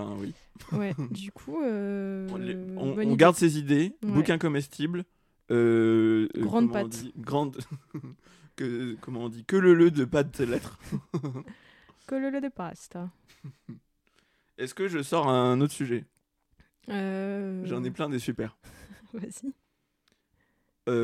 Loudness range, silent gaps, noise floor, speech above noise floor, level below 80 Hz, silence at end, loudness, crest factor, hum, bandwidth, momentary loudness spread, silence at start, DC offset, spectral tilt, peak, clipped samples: 11 LU; none; -74 dBFS; 47 dB; -62 dBFS; 0 s; -28 LUFS; 24 dB; none; 15 kHz; 18 LU; 0 s; under 0.1%; -6.5 dB/octave; -4 dBFS; under 0.1%